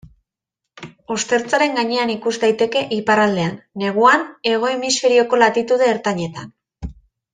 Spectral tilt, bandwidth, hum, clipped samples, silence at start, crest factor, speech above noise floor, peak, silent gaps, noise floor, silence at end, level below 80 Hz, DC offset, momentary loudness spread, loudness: -3.5 dB/octave; 9.6 kHz; none; under 0.1%; 0.8 s; 18 dB; 65 dB; -2 dBFS; none; -82 dBFS; 0.4 s; -48 dBFS; under 0.1%; 14 LU; -17 LUFS